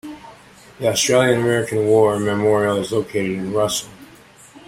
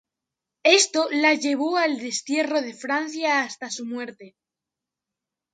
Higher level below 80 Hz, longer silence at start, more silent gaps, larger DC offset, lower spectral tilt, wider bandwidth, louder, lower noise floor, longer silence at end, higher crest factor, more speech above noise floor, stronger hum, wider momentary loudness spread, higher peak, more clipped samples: first, -54 dBFS vs -80 dBFS; second, 0.05 s vs 0.65 s; neither; neither; first, -4.5 dB/octave vs -0.5 dB/octave; first, 16.5 kHz vs 9.6 kHz; first, -18 LUFS vs -22 LUFS; second, -46 dBFS vs -87 dBFS; second, 0.1 s vs 1.25 s; second, 16 dB vs 22 dB; second, 28 dB vs 64 dB; neither; second, 9 LU vs 14 LU; about the same, -2 dBFS vs -4 dBFS; neither